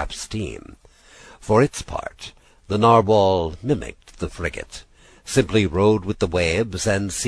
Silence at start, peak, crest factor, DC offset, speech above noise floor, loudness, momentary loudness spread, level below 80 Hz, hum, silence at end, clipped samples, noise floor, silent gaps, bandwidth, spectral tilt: 0 s; -2 dBFS; 20 dB; under 0.1%; 27 dB; -20 LUFS; 21 LU; -40 dBFS; none; 0 s; under 0.1%; -48 dBFS; none; 11 kHz; -5.5 dB/octave